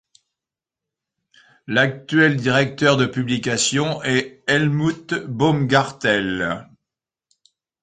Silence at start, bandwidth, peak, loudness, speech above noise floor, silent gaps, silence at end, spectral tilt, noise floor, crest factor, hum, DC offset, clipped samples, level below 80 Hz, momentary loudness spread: 1.7 s; 9.6 kHz; -2 dBFS; -19 LUFS; 69 dB; none; 1.2 s; -4.5 dB/octave; -88 dBFS; 20 dB; none; under 0.1%; under 0.1%; -56 dBFS; 7 LU